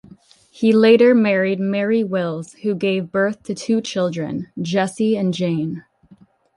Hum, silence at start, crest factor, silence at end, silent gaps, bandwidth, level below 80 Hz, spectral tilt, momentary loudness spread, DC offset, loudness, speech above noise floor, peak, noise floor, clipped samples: none; 0.55 s; 16 dB; 0.75 s; none; 11.5 kHz; -62 dBFS; -6.5 dB/octave; 14 LU; under 0.1%; -19 LUFS; 33 dB; -2 dBFS; -51 dBFS; under 0.1%